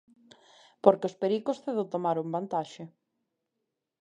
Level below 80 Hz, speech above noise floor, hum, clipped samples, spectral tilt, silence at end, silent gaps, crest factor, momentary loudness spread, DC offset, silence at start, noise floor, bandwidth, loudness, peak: -80 dBFS; 56 dB; none; under 0.1%; -7 dB/octave; 1.15 s; none; 28 dB; 15 LU; under 0.1%; 0.85 s; -84 dBFS; 9.8 kHz; -29 LUFS; -4 dBFS